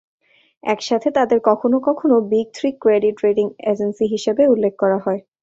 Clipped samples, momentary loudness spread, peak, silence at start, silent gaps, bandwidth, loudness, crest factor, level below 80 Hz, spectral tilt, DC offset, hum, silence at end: under 0.1%; 6 LU; -2 dBFS; 0.65 s; none; 7.8 kHz; -18 LUFS; 16 dB; -62 dBFS; -6 dB/octave; under 0.1%; none; 0.2 s